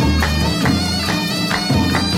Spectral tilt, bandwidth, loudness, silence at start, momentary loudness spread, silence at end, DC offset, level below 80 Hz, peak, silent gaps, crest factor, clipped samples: -4.5 dB/octave; 16.5 kHz; -17 LUFS; 0 s; 2 LU; 0 s; under 0.1%; -26 dBFS; -4 dBFS; none; 12 dB; under 0.1%